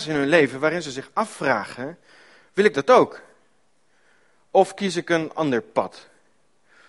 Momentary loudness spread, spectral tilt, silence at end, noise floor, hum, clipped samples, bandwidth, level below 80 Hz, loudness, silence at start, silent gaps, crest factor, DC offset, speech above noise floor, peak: 13 LU; -5 dB/octave; 0.9 s; -66 dBFS; none; under 0.1%; 11.5 kHz; -66 dBFS; -21 LUFS; 0 s; none; 22 dB; under 0.1%; 45 dB; 0 dBFS